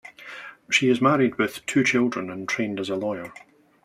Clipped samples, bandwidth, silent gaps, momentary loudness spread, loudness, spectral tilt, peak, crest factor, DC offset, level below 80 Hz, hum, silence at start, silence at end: under 0.1%; 15.5 kHz; none; 19 LU; -23 LUFS; -4.5 dB/octave; -6 dBFS; 18 dB; under 0.1%; -66 dBFS; none; 0.05 s; 0.45 s